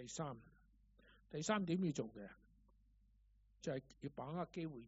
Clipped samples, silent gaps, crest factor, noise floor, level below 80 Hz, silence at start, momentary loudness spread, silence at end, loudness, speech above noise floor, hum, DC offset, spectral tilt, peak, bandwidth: under 0.1%; none; 24 dB; -72 dBFS; -72 dBFS; 0 s; 14 LU; 0 s; -45 LUFS; 28 dB; none; under 0.1%; -5.5 dB/octave; -22 dBFS; 7.6 kHz